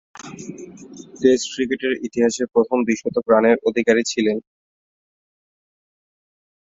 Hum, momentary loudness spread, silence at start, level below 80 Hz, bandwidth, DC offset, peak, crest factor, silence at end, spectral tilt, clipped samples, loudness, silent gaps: none; 21 LU; 0.15 s; -62 dBFS; 7.8 kHz; under 0.1%; -2 dBFS; 20 dB; 2.35 s; -4 dB/octave; under 0.1%; -19 LUFS; none